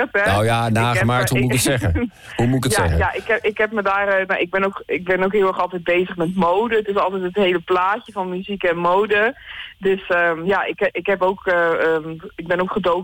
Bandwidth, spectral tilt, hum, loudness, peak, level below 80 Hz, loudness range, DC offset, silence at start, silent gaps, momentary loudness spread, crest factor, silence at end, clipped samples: 17.5 kHz; -5 dB/octave; none; -19 LUFS; -8 dBFS; -40 dBFS; 1 LU; under 0.1%; 0 s; none; 7 LU; 10 dB; 0 s; under 0.1%